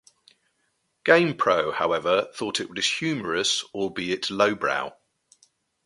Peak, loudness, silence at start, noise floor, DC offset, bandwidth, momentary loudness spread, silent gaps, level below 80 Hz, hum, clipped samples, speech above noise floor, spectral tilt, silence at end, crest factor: -2 dBFS; -24 LUFS; 1.05 s; -73 dBFS; under 0.1%; 11.5 kHz; 9 LU; none; -64 dBFS; none; under 0.1%; 49 dB; -3 dB/octave; 0.95 s; 24 dB